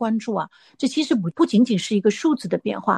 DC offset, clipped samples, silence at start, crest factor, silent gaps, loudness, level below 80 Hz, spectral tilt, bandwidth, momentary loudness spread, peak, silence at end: under 0.1%; under 0.1%; 0 s; 16 dB; none; -21 LUFS; -68 dBFS; -5.5 dB/octave; 11 kHz; 9 LU; -6 dBFS; 0 s